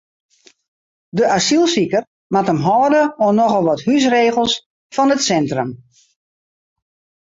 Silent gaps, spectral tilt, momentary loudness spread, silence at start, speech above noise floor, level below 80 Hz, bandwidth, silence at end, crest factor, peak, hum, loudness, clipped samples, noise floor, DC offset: 2.07-2.30 s, 4.66-4.90 s; -4.5 dB/octave; 8 LU; 1.15 s; over 75 dB; -58 dBFS; 8 kHz; 1.45 s; 14 dB; -2 dBFS; none; -16 LUFS; under 0.1%; under -90 dBFS; under 0.1%